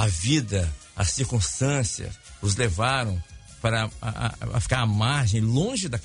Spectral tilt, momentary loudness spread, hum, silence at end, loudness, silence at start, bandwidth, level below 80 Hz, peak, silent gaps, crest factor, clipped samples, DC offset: -4.5 dB/octave; 8 LU; none; 0 s; -25 LUFS; 0 s; 11 kHz; -40 dBFS; -6 dBFS; none; 20 dB; under 0.1%; under 0.1%